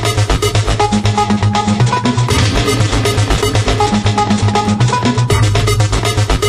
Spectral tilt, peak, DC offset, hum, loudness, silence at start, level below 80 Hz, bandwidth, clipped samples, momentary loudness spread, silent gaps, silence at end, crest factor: -5 dB/octave; -2 dBFS; under 0.1%; none; -13 LUFS; 0 s; -22 dBFS; 12.5 kHz; under 0.1%; 1 LU; none; 0 s; 12 dB